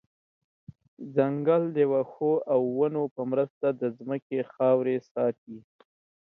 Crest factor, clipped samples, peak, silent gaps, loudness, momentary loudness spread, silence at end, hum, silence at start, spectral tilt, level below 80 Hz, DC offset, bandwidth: 18 dB; under 0.1%; -10 dBFS; 3.11-3.16 s, 3.50-3.61 s, 4.22-4.30 s, 5.11-5.15 s, 5.38-5.47 s; -27 LUFS; 9 LU; 0.75 s; none; 1 s; -10 dB/octave; -76 dBFS; under 0.1%; 4.1 kHz